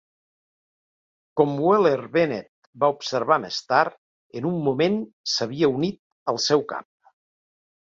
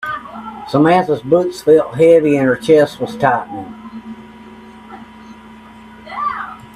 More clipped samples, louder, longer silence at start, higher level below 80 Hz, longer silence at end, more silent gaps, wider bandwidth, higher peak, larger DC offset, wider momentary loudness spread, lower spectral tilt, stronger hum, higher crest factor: neither; second, -23 LUFS vs -14 LUFS; first, 1.35 s vs 0 s; second, -66 dBFS vs -52 dBFS; first, 1 s vs 0.1 s; first, 2.49-2.73 s, 3.98-4.30 s, 5.13-5.24 s, 5.99-6.26 s vs none; second, 7.8 kHz vs 12.5 kHz; second, -4 dBFS vs 0 dBFS; neither; second, 11 LU vs 23 LU; second, -5 dB/octave vs -7 dB/octave; neither; about the same, 20 dB vs 16 dB